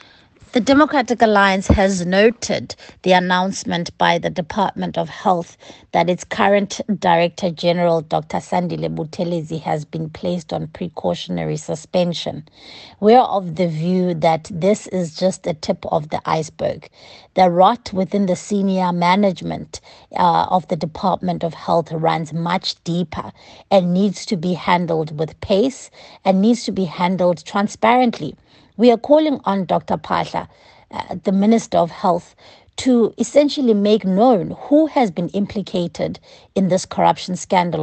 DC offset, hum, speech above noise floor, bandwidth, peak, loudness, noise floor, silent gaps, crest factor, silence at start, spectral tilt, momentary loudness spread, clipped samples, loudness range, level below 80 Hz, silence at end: under 0.1%; none; 30 dB; 8.8 kHz; 0 dBFS; -18 LUFS; -48 dBFS; none; 18 dB; 0.55 s; -6 dB/octave; 11 LU; under 0.1%; 4 LU; -44 dBFS; 0 s